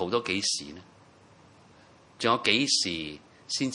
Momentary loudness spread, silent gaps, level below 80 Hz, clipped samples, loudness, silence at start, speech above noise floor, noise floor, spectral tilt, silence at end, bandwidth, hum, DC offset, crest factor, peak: 17 LU; none; -68 dBFS; under 0.1%; -26 LUFS; 0 s; 28 dB; -56 dBFS; -2 dB/octave; 0 s; 11.5 kHz; none; under 0.1%; 24 dB; -6 dBFS